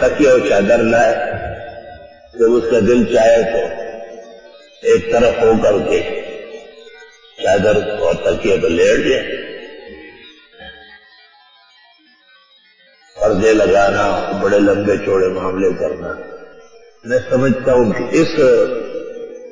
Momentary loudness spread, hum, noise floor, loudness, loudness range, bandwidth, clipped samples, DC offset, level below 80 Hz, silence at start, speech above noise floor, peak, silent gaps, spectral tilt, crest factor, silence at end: 20 LU; none; -50 dBFS; -14 LUFS; 4 LU; 7.6 kHz; under 0.1%; under 0.1%; -40 dBFS; 0 s; 37 dB; -2 dBFS; none; -5.5 dB/octave; 12 dB; 0 s